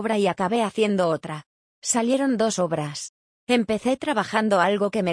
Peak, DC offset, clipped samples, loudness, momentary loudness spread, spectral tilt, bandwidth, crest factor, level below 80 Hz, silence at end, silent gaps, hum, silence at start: -6 dBFS; under 0.1%; under 0.1%; -23 LUFS; 13 LU; -4.5 dB/octave; 10.5 kHz; 16 dB; -64 dBFS; 0 s; 1.46-1.82 s, 3.09-3.47 s; none; 0 s